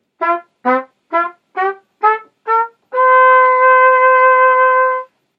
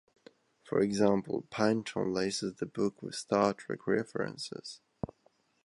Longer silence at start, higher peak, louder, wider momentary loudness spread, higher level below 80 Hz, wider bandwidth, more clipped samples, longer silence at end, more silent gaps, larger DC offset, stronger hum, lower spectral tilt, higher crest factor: second, 0.2 s vs 0.65 s; first, 0 dBFS vs -12 dBFS; first, -12 LUFS vs -32 LUFS; second, 12 LU vs 15 LU; second, -80 dBFS vs -66 dBFS; second, 4.9 kHz vs 11.5 kHz; neither; second, 0.35 s vs 0.6 s; neither; neither; neither; about the same, -4.5 dB/octave vs -5 dB/octave; second, 12 dB vs 22 dB